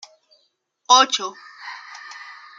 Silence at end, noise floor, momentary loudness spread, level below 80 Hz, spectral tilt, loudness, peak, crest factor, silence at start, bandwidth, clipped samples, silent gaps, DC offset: 0.25 s; -67 dBFS; 23 LU; -90 dBFS; 1.5 dB/octave; -16 LUFS; -2 dBFS; 22 dB; 0.9 s; 9 kHz; under 0.1%; none; under 0.1%